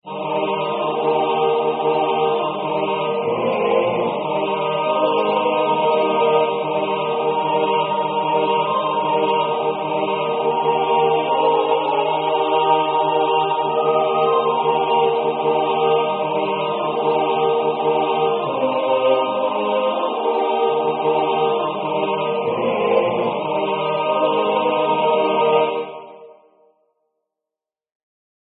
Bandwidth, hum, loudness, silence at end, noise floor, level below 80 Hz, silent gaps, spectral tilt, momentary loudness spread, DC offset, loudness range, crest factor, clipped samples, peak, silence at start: 4.3 kHz; none; -19 LUFS; 2.15 s; -87 dBFS; -66 dBFS; none; -10 dB/octave; 4 LU; under 0.1%; 2 LU; 16 dB; under 0.1%; -4 dBFS; 0.05 s